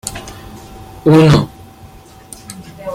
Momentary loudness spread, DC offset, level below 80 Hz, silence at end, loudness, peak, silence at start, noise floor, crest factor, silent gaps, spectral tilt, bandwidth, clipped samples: 26 LU; under 0.1%; -38 dBFS; 0 s; -10 LUFS; 0 dBFS; 0.05 s; -38 dBFS; 16 dB; none; -6.5 dB/octave; 15.5 kHz; under 0.1%